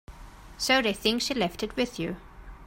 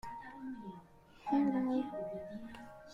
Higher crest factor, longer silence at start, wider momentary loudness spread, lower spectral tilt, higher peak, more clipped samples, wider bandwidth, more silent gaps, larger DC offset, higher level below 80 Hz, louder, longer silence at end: about the same, 20 dB vs 18 dB; about the same, 0.1 s vs 0.05 s; second, 12 LU vs 18 LU; second, -3 dB/octave vs -7.5 dB/octave; first, -8 dBFS vs -22 dBFS; neither; first, 16.5 kHz vs 7.4 kHz; neither; neither; first, -48 dBFS vs -68 dBFS; first, -27 LUFS vs -38 LUFS; about the same, 0 s vs 0 s